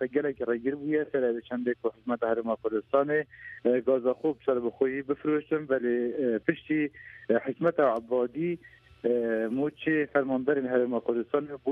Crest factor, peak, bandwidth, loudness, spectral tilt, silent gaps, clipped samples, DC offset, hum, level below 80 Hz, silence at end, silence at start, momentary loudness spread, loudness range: 20 dB; -10 dBFS; 4.1 kHz; -29 LUFS; -9 dB/octave; none; under 0.1%; under 0.1%; none; -68 dBFS; 0 s; 0 s; 5 LU; 1 LU